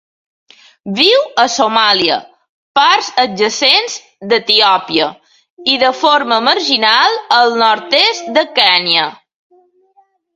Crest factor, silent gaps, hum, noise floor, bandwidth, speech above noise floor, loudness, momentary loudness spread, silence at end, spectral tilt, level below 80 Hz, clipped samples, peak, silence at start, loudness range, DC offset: 14 dB; 2.49-2.75 s, 5.50-5.57 s; none; -54 dBFS; 16 kHz; 42 dB; -11 LUFS; 8 LU; 1.2 s; -2 dB/octave; -60 dBFS; under 0.1%; 0 dBFS; 0.85 s; 2 LU; under 0.1%